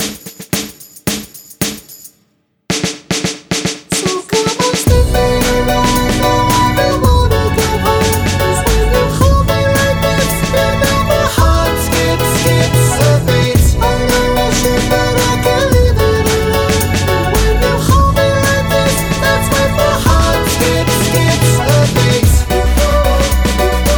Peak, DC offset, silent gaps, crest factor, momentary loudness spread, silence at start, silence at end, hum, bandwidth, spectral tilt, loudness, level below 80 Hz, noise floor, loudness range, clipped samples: 0 dBFS; under 0.1%; none; 12 dB; 6 LU; 0 s; 0 s; none; over 20 kHz; -4.5 dB/octave; -12 LUFS; -18 dBFS; -58 dBFS; 4 LU; under 0.1%